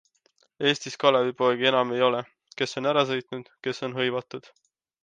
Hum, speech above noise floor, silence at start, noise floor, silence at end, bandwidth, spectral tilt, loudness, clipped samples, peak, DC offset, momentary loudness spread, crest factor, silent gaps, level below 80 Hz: none; 42 dB; 0.6 s; -67 dBFS; 0.65 s; 9.4 kHz; -4.5 dB/octave; -25 LUFS; under 0.1%; -4 dBFS; under 0.1%; 12 LU; 22 dB; none; -76 dBFS